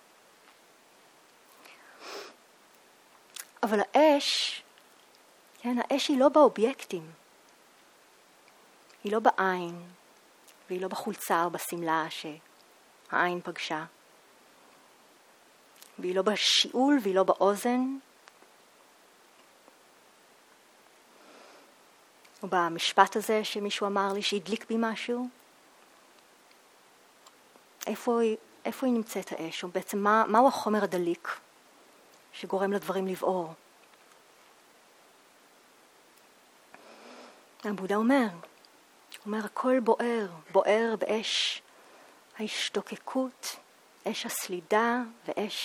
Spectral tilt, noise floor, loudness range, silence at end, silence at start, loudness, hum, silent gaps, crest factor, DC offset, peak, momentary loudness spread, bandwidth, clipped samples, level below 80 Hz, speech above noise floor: -3.5 dB/octave; -59 dBFS; 9 LU; 0 s; 1.7 s; -28 LUFS; none; none; 28 dB; under 0.1%; -4 dBFS; 19 LU; 19.5 kHz; under 0.1%; -84 dBFS; 31 dB